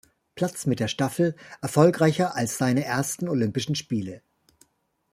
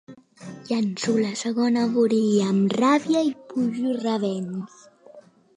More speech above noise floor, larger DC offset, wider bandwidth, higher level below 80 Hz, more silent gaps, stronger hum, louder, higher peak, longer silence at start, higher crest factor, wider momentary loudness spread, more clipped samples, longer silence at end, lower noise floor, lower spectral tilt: first, 45 dB vs 27 dB; neither; first, 16 kHz vs 10.5 kHz; first, -64 dBFS vs -74 dBFS; neither; neither; about the same, -25 LUFS vs -23 LUFS; first, -4 dBFS vs -8 dBFS; first, 0.35 s vs 0.1 s; first, 22 dB vs 16 dB; second, 10 LU vs 14 LU; neither; first, 0.95 s vs 0.35 s; first, -69 dBFS vs -49 dBFS; about the same, -5.5 dB/octave vs -5.5 dB/octave